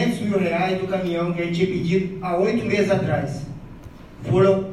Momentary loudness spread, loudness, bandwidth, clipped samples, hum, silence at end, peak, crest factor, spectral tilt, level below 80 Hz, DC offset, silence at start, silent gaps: 16 LU; -22 LUFS; 12.5 kHz; under 0.1%; none; 0 s; -6 dBFS; 16 dB; -7 dB/octave; -46 dBFS; under 0.1%; 0 s; none